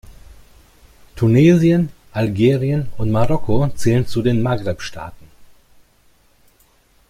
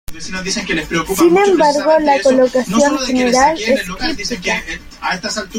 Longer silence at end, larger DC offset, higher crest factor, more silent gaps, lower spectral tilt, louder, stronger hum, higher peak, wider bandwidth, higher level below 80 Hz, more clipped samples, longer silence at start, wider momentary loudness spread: first, 1.95 s vs 0 s; neither; about the same, 16 dB vs 14 dB; neither; first, -7.5 dB/octave vs -3.5 dB/octave; second, -17 LUFS vs -14 LUFS; neither; about the same, -2 dBFS vs -2 dBFS; about the same, 15 kHz vs 16.5 kHz; about the same, -40 dBFS vs -38 dBFS; neither; about the same, 0.1 s vs 0.1 s; first, 14 LU vs 9 LU